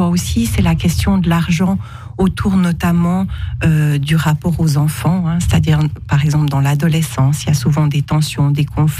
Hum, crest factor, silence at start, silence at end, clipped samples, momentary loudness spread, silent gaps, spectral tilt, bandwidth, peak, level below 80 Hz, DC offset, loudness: none; 12 dB; 0 s; 0 s; under 0.1%; 3 LU; none; -6.5 dB/octave; 15.5 kHz; -2 dBFS; -30 dBFS; under 0.1%; -15 LUFS